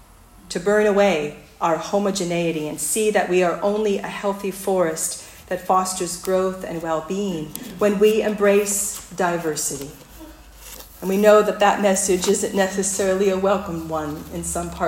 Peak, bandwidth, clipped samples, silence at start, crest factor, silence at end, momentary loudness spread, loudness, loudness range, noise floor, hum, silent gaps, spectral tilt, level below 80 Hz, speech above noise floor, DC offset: -2 dBFS; 16.5 kHz; under 0.1%; 0.45 s; 20 dB; 0 s; 12 LU; -21 LUFS; 4 LU; -47 dBFS; none; none; -4 dB/octave; -50 dBFS; 26 dB; under 0.1%